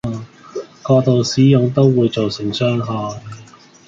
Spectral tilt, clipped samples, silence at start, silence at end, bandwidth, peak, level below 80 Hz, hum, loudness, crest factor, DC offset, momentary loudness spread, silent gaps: -7 dB/octave; under 0.1%; 0.05 s; 0.45 s; 7.8 kHz; -2 dBFS; -50 dBFS; none; -16 LUFS; 16 dB; under 0.1%; 18 LU; none